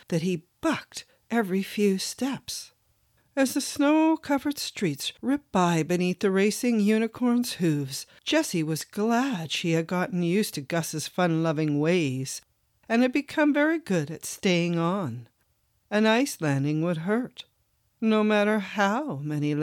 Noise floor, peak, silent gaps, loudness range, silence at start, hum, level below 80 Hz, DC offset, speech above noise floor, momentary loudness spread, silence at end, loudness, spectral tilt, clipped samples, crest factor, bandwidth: -70 dBFS; -10 dBFS; none; 2 LU; 0.1 s; none; -68 dBFS; under 0.1%; 45 dB; 8 LU; 0 s; -26 LUFS; -5 dB/octave; under 0.1%; 16 dB; 17.5 kHz